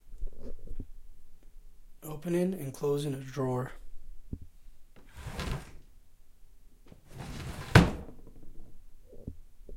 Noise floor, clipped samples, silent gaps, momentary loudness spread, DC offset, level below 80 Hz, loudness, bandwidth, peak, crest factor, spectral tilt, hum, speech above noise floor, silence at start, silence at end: -53 dBFS; under 0.1%; none; 27 LU; under 0.1%; -44 dBFS; -31 LUFS; 16.5 kHz; -4 dBFS; 30 dB; -6 dB/octave; none; 20 dB; 0.05 s; 0 s